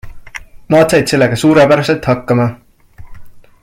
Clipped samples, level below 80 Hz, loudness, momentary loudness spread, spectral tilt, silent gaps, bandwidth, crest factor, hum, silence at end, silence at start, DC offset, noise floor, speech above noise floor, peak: under 0.1%; -40 dBFS; -11 LUFS; 22 LU; -6 dB/octave; none; 16 kHz; 12 dB; none; 0.25 s; 0.05 s; under 0.1%; -33 dBFS; 22 dB; 0 dBFS